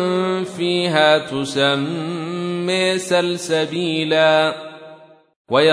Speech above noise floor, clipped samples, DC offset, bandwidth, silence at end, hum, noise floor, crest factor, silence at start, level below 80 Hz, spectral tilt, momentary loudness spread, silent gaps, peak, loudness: 25 dB; under 0.1%; under 0.1%; 11 kHz; 0 s; none; -44 dBFS; 18 dB; 0 s; -64 dBFS; -4.5 dB/octave; 10 LU; 5.36-5.45 s; -2 dBFS; -18 LUFS